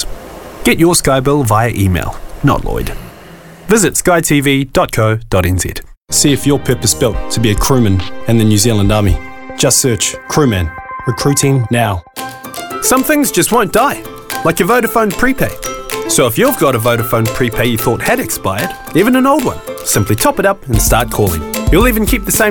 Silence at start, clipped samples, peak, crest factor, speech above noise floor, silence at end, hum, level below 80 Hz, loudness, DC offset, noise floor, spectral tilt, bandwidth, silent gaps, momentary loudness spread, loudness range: 0 s; under 0.1%; 0 dBFS; 12 dB; 23 dB; 0 s; none; -26 dBFS; -12 LUFS; under 0.1%; -35 dBFS; -4.5 dB/octave; 19 kHz; 5.97-6.01 s; 11 LU; 2 LU